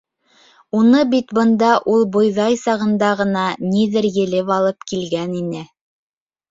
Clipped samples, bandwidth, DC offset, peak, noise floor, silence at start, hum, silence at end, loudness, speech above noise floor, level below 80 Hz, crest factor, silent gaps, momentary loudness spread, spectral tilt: under 0.1%; 7.8 kHz; under 0.1%; -2 dBFS; -54 dBFS; 0.75 s; none; 0.85 s; -17 LUFS; 38 dB; -58 dBFS; 16 dB; none; 10 LU; -6 dB/octave